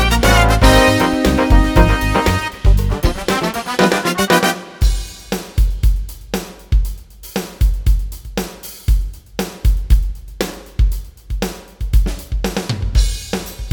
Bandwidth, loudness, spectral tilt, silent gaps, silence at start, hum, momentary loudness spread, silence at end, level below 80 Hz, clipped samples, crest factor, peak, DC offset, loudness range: 19.5 kHz; -17 LUFS; -5 dB/octave; none; 0 s; none; 14 LU; 0 s; -18 dBFS; under 0.1%; 16 dB; 0 dBFS; under 0.1%; 7 LU